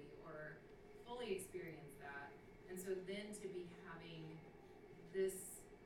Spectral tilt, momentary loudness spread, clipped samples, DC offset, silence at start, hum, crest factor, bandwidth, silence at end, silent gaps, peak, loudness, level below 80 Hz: -4.5 dB/octave; 16 LU; under 0.1%; under 0.1%; 0 s; none; 18 dB; 17.5 kHz; 0 s; none; -32 dBFS; -50 LUFS; -72 dBFS